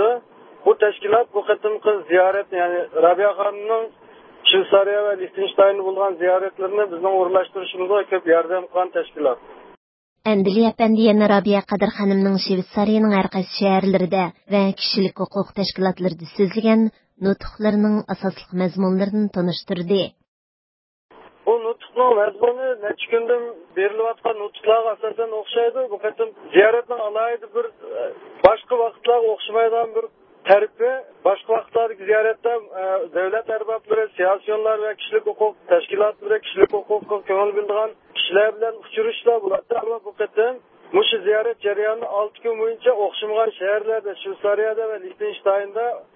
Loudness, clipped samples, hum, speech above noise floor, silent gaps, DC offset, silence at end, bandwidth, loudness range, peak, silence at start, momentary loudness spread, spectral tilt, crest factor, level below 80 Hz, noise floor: -20 LUFS; under 0.1%; none; 20 dB; 9.77-10.16 s, 20.28-21.09 s; under 0.1%; 0.15 s; 5.8 kHz; 4 LU; 0 dBFS; 0 s; 9 LU; -9.5 dB/octave; 20 dB; -58 dBFS; -40 dBFS